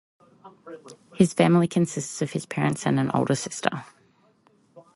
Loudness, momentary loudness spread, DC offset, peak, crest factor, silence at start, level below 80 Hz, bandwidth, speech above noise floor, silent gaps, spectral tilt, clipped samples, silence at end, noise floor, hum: -24 LUFS; 23 LU; under 0.1%; -2 dBFS; 24 dB; 0.45 s; -64 dBFS; 11.5 kHz; 38 dB; none; -6 dB/octave; under 0.1%; 0.15 s; -62 dBFS; none